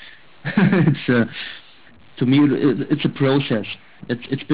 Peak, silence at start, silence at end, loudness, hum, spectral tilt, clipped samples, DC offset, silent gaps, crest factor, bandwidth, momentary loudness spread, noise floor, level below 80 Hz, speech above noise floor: -6 dBFS; 0 s; 0 s; -19 LUFS; none; -11.5 dB/octave; under 0.1%; 0.6%; none; 14 dB; 4 kHz; 16 LU; -49 dBFS; -56 dBFS; 31 dB